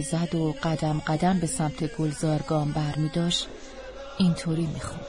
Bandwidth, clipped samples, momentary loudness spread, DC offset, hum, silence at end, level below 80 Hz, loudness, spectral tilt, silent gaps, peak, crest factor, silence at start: 11 kHz; under 0.1%; 9 LU; under 0.1%; none; 0 s; -46 dBFS; -27 LUFS; -5.5 dB/octave; none; -10 dBFS; 16 dB; 0 s